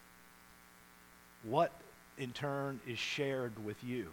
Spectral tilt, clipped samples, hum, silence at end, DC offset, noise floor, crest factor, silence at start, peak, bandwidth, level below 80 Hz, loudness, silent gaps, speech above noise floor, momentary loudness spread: -5 dB/octave; under 0.1%; none; 0 s; under 0.1%; -61 dBFS; 22 dB; 0 s; -18 dBFS; 19 kHz; -74 dBFS; -39 LUFS; none; 23 dB; 25 LU